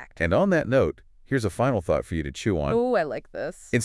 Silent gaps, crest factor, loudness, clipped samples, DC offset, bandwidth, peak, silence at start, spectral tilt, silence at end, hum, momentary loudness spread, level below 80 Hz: none; 16 dB; -25 LUFS; under 0.1%; under 0.1%; 12 kHz; -10 dBFS; 0 s; -6.5 dB/octave; 0 s; none; 10 LU; -46 dBFS